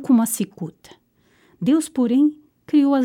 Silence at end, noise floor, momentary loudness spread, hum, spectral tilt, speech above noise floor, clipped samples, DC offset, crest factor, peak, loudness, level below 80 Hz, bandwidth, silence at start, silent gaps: 0 s; -59 dBFS; 11 LU; none; -5.5 dB/octave; 40 dB; under 0.1%; under 0.1%; 14 dB; -6 dBFS; -20 LUFS; -68 dBFS; 17 kHz; 0 s; none